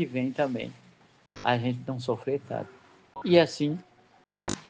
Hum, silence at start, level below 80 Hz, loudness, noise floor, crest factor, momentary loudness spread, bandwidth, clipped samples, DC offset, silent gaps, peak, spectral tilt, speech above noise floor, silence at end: none; 0 s; -64 dBFS; -28 LUFS; -62 dBFS; 22 dB; 17 LU; 9.6 kHz; under 0.1%; under 0.1%; none; -6 dBFS; -6 dB/octave; 35 dB; 0.05 s